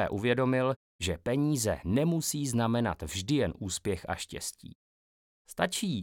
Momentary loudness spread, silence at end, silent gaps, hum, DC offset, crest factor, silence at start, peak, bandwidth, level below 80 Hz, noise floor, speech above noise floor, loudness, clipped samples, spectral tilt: 9 LU; 0 s; 0.76-0.99 s, 4.75-5.45 s; none; under 0.1%; 20 dB; 0 s; -12 dBFS; 19 kHz; -56 dBFS; under -90 dBFS; over 60 dB; -31 LUFS; under 0.1%; -5 dB/octave